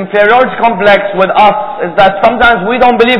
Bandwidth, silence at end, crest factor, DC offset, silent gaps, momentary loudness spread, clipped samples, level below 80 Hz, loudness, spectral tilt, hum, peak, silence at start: 5.4 kHz; 0 s; 8 dB; under 0.1%; none; 3 LU; 3%; -36 dBFS; -8 LUFS; -7 dB/octave; none; 0 dBFS; 0 s